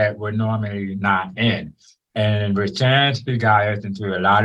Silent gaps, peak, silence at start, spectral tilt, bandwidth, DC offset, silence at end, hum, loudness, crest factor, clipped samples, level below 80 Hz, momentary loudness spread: none; -2 dBFS; 0 s; -6.5 dB/octave; 8 kHz; under 0.1%; 0 s; none; -20 LUFS; 16 dB; under 0.1%; -56 dBFS; 9 LU